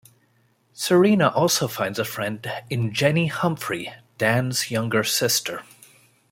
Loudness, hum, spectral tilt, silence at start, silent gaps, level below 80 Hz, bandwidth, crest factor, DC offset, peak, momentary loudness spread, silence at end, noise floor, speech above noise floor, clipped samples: -22 LUFS; none; -4 dB/octave; 0.75 s; none; -64 dBFS; 16.5 kHz; 20 dB; under 0.1%; -4 dBFS; 11 LU; 0.7 s; -63 dBFS; 41 dB; under 0.1%